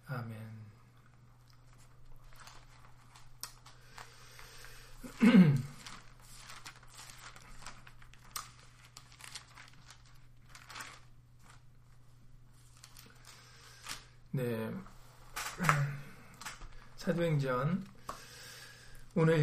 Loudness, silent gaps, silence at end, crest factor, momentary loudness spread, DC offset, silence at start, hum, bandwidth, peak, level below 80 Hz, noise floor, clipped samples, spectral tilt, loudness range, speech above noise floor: -34 LUFS; none; 0 s; 28 dB; 24 LU; under 0.1%; 0.1 s; none; 15.5 kHz; -8 dBFS; -58 dBFS; -60 dBFS; under 0.1%; -6.5 dB/octave; 22 LU; 33 dB